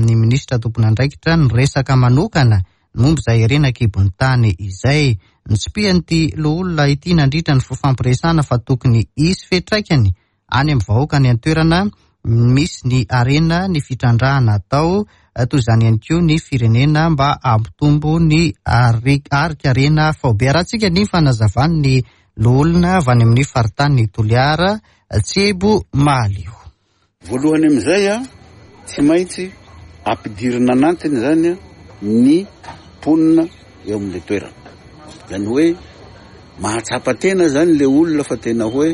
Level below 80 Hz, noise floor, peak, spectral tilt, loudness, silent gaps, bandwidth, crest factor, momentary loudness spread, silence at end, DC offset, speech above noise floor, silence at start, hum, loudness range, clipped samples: -34 dBFS; -60 dBFS; -2 dBFS; -6.5 dB/octave; -15 LUFS; none; 11.5 kHz; 12 dB; 9 LU; 0 s; under 0.1%; 46 dB; 0 s; none; 3 LU; under 0.1%